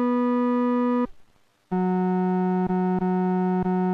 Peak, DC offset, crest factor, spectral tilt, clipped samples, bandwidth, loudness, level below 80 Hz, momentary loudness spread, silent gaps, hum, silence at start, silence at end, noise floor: -16 dBFS; under 0.1%; 8 dB; -10.5 dB/octave; under 0.1%; 4.4 kHz; -24 LUFS; -56 dBFS; 4 LU; none; none; 0 s; 0 s; -57 dBFS